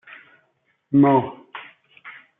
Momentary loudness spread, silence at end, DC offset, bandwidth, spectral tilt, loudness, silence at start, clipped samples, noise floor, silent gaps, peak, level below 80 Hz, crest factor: 25 LU; 0.3 s; under 0.1%; 3.8 kHz; -7.5 dB/octave; -18 LUFS; 0.9 s; under 0.1%; -68 dBFS; none; -6 dBFS; -68 dBFS; 18 dB